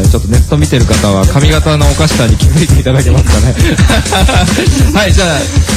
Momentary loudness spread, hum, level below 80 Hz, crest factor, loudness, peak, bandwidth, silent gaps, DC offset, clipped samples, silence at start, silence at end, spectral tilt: 1 LU; none; -12 dBFS; 8 dB; -8 LUFS; 0 dBFS; 15.5 kHz; none; under 0.1%; 0.2%; 0 s; 0 s; -5 dB/octave